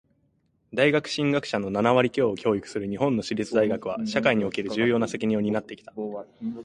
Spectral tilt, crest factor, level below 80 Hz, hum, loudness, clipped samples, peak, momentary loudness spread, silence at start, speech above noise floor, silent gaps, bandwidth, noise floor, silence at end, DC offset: -6 dB/octave; 20 dB; -60 dBFS; none; -25 LUFS; under 0.1%; -6 dBFS; 12 LU; 0.7 s; 43 dB; none; 11 kHz; -68 dBFS; 0 s; under 0.1%